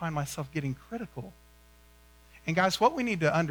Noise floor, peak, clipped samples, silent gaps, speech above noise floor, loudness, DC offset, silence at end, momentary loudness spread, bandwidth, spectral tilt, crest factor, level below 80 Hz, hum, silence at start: -58 dBFS; -12 dBFS; under 0.1%; none; 28 dB; -29 LUFS; under 0.1%; 0 s; 16 LU; over 20 kHz; -5 dB/octave; 18 dB; -58 dBFS; 60 Hz at -55 dBFS; 0 s